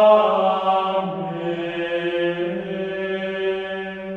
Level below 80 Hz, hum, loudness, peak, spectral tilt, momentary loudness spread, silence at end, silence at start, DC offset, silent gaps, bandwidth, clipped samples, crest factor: -60 dBFS; none; -22 LUFS; -4 dBFS; -7 dB/octave; 9 LU; 0 s; 0 s; under 0.1%; none; 6.6 kHz; under 0.1%; 18 dB